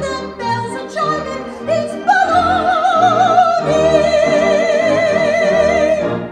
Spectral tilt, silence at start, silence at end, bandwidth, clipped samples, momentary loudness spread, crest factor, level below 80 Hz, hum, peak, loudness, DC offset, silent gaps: -5 dB/octave; 0 s; 0 s; 10.5 kHz; under 0.1%; 9 LU; 14 dB; -42 dBFS; none; 0 dBFS; -14 LUFS; under 0.1%; none